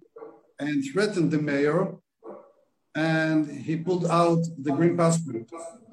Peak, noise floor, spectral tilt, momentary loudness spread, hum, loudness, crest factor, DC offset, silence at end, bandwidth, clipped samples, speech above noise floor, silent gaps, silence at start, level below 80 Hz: -8 dBFS; -62 dBFS; -6.5 dB/octave; 19 LU; none; -25 LUFS; 18 dB; under 0.1%; 0.15 s; 10.5 kHz; under 0.1%; 37 dB; none; 0.15 s; -72 dBFS